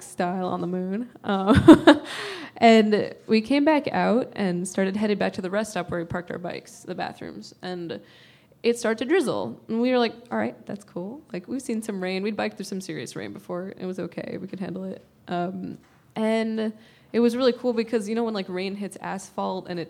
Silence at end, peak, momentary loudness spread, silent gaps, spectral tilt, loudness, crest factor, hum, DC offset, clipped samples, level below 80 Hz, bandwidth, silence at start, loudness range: 0 s; 0 dBFS; 16 LU; none; -6 dB/octave; -24 LUFS; 24 dB; none; under 0.1%; under 0.1%; -52 dBFS; 14.5 kHz; 0 s; 13 LU